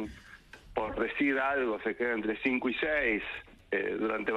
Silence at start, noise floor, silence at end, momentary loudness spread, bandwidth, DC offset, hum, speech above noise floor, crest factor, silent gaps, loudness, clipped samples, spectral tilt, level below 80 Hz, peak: 0 s; -53 dBFS; 0 s; 12 LU; 11 kHz; under 0.1%; none; 22 dB; 16 dB; none; -31 LUFS; under 0.1%; -6 dB/octave; -56 dBFS; -16 dBFS